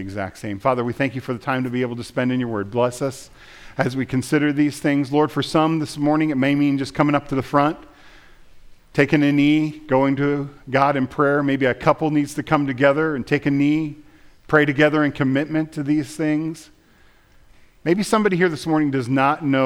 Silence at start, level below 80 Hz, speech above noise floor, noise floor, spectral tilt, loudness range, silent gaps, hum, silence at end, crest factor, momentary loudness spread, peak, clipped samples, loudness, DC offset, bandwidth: 0 s; -52 dBFS; 33 dB; -53 dBFS; -6.5 dB/octave; 4 LU; none; none; 0 s; 18 dB; 8 LU; -2 dBFS; under 0.1%; -20 LUFS; under 0.1%; 14 kHz